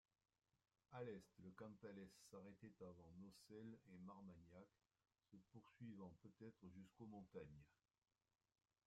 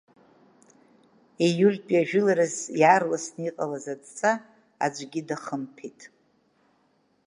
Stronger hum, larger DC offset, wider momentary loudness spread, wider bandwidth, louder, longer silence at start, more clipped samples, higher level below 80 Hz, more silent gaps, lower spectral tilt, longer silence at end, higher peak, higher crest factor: neither; neither; second, 7 LU vs 15 LU; first, 13 kHz vs 11 kHz; second, -62 LUFS vs -25 LUFS; second, 0.9 s vs 1.4 s; neither; second, -86 dBFS vs -80 dBFS; neither; first, -6.5 dB/octave vs -5 dB/octave; about the same, 1.1 s vs 1.2 s; second, -44 dBFS vs -6 dBFS; about the same, 20 dB vs 22 dB